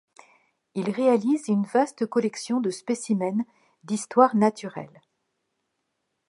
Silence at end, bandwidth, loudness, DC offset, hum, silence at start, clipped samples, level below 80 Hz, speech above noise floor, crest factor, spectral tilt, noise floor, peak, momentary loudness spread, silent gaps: 1.4 s; 11.5 kHz; -24 LUFS; under 0.1%; none; 0.75 s; under 0.1%; -78 dBFS; 54 dB; 22 dB; -6 dB/octave; -78 dBFS; -4 dBFS; 16 LU; none